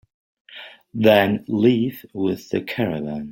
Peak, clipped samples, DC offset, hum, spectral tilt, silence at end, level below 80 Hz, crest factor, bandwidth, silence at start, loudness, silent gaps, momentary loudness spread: -2 dBFS; under 0.1%; under 0.1%; none; -7 dB/octave; 0 s; -58 dBFS; 20 dB; 16.5 kHz; 0.5 s; -20 LUFS; none; 20 LU